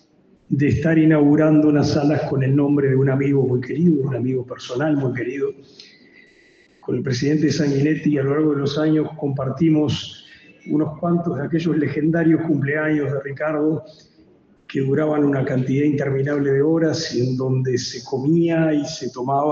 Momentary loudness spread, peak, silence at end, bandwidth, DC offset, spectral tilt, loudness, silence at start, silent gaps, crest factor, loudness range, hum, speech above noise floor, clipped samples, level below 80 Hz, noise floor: 8 LU; -6 dBFS; 0 s; 7.2 kHz; under 0.1%; -7 dB/octave; -20 LUFS; 0.5 s; none; 14 dB; 6 LU; none; 36 dB; under 0.1%; -54 dBFS; -55 dBFS